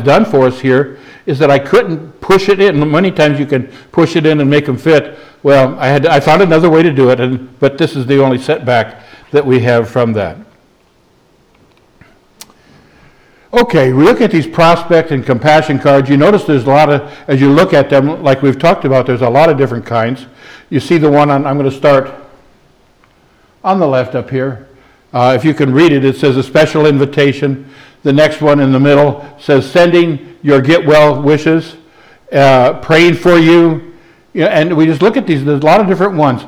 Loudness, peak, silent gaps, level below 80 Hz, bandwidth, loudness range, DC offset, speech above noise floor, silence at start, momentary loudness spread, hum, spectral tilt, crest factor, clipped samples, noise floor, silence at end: -10 LUFS; 0 dBFS; none; -44 dBFS; 14 kHz; 6 LU; under 0.1%; 41 dB; 0 s; 9 LU; none; -7 dB/octave; 10 dB; under 0.1%; -50 dBFS; 0 s